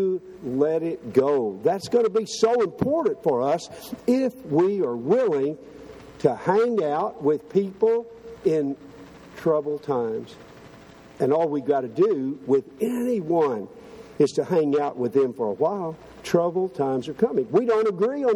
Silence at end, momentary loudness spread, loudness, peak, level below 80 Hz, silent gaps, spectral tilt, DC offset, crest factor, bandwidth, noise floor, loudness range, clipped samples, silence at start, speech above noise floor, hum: 0 s; 9 LU; -24 LUFS; -4 dBFS; -62 dBFS; none; -6.5 dB/octave; under 0.1%; 20 dB; 13.5 kHz; -47 dBFS; 3 LU; under 0.1%; 0 s; 24 dB; none